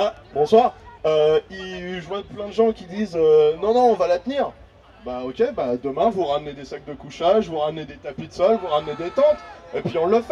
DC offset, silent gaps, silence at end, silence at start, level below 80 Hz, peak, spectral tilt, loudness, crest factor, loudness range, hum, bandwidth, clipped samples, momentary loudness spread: under 0.1%; none; 0 s; 0 s; -52 dBFS; -2 dBFS; -6 dB/octave; -21 LUFS; 18 dB; 4 LU; none; 7.6 kHz; under 0.1%; 16 LU